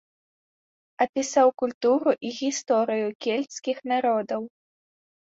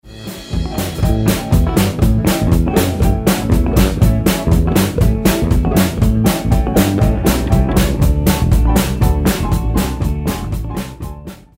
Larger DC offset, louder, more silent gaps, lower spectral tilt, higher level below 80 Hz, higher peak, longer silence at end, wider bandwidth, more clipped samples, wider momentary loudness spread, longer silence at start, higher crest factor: neither; second, -25 LUFS vs -15 LUFS; first, 1.09-1.13 s, 1.74-1.81 s, 3.15-3.19 s vs none; second, -3.5 dB/octave vs -6 dB/octave; second, -74 dBFS vs -18 dBFS; second, -8 dBFS vs 0 dBFS; first, 0.9 s vs 0.2 s; second, 8 kHz vs 16.5 kHz; neither; about the same, 9 LU vs 9 LU; first, 1 s vs 0.05 s; about the same, 18 dB vs 14 dB